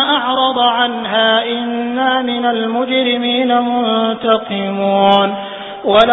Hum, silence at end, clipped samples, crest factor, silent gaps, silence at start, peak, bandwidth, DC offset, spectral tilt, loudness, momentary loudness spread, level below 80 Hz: none; 0 s; under 0.1%; 14 dB; none; 0 s; 0 dBFS; 8 kHz; under 0.1%; -6.5 dB/octave; -14 LUFS; 7 LU; -54 dBFS